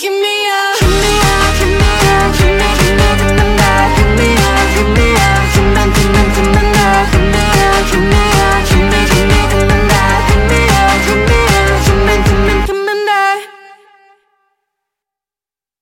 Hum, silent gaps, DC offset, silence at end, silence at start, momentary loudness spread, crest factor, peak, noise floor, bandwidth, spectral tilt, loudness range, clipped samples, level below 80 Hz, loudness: none; none; under 0.1%; 2.3 s; 0 s; 3 LU; 10 dB; 0 dBFS; under -90 dBFS; 17 kHz; -4.5 dB/octave; 3 LU; under 0.1%; -16 dBFS; -10 LUFS